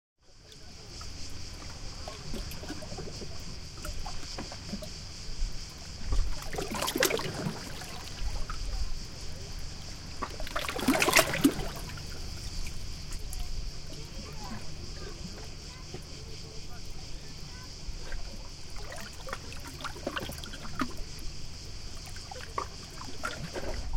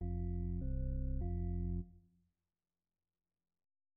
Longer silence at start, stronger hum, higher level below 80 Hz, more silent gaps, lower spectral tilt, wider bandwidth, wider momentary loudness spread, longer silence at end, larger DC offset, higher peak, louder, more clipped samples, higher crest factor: first, 0.3 s vs 0 s; neither; about the same, -40 dBFS vs -44 dBFS; neither; second, -3.5 dB/octave vs -14 dB/octave; first, 17 kHz vs 2.1 kHz; first, 15 LU vs 3 LU; second, 0 s vs 1.95 s; neither; first, -6 dBFS vs -30 dBFS; first, -36 LUFS vs -42 LUFS; neither; first, 28 dB vs 12 dB